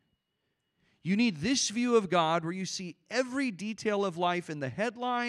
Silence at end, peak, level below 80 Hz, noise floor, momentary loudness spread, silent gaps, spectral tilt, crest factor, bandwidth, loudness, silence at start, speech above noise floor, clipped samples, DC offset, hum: 0 s; -12 dBFS; -70 dBFS; -81 dBFS; 9 LU; none; -4 dB/octave; 20 dB; 12 kHz; -30 LUFS; 1.05 s; 51 dB; under 0.1%; under 0.1%; none